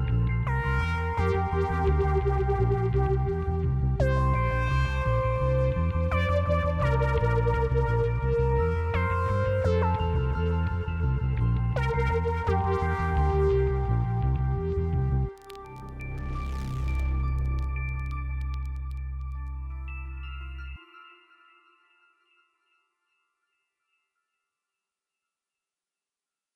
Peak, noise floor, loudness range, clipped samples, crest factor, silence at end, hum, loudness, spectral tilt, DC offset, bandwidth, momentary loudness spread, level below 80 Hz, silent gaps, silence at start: -12 dBFS; under -90 dBFS; 11 LU; under 0.1%; 14 dB; 5.45 s; none; -27 LUFS; -8.5 dB/octave; under 0.1%; 7.2 kHz; 12 LU; -32 dBFS; none; 0 s